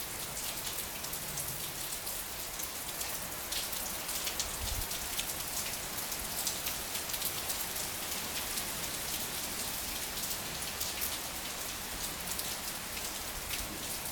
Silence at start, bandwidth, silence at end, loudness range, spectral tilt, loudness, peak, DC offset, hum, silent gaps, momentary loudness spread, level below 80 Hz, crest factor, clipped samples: 0 s; over 20 kHz; 0 s; 2 LU; -1 dB/octave; -35 LUFS; -12 dBFS; under 0.1%; none; none; 3 LU; -52 dBFS; 24 dB; under 0.1%